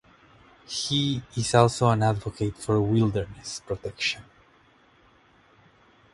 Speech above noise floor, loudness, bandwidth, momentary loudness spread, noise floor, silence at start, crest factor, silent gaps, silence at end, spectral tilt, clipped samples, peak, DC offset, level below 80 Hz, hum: 34 dB; -25 LUFS; 11.5 kHz; 13 LU; -59 dBFS; 0.7 s; 24 dB; none; 1.9 s; -5 dB/octave; under 0.1%; -2 dBFS; under 0.1%; -52 dBFS; none